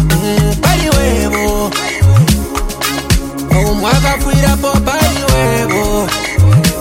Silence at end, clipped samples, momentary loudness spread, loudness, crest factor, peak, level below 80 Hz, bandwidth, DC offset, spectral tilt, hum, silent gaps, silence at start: 0 s; under 0.1%; 6 LU; -12 LUFS; 12 dB; 0 dBFS; -18 dBFS; 17 kHz; under 0.1%; -5 dB/octave; none; none; 0 s